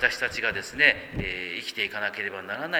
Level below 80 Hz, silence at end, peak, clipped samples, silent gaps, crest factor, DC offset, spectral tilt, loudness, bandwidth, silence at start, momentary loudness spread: -50 dBFS; 0 s; -4 dBFS; under 0.1%; none; 24 dB; under 0.1%; -3 dB/octave; -26 LUFS; over 20 kHz; 0 s; 11 LU